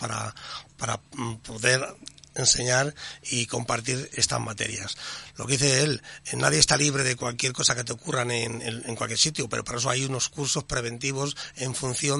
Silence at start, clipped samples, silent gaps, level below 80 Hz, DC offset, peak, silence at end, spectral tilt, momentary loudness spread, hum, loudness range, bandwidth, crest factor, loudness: 0 s; under 0.1%; none; -52 dBFS; under 0.1%; -2 dBFS; 0 s; -2.5 dB/octave; 13 LU; none; 3 LU; 11.5 kHz; 26 dB; -25 LUFS